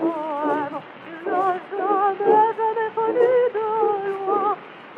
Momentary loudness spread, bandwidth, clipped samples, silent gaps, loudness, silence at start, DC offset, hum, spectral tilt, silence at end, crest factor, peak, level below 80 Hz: 11 LU; 4.9 kHz; under 0.1%; none; -21 LUFS; 0 s; under 0.1%; none; -7 dB/octave; 0 s; 16 dB; -6 dBFS; -80 dBFS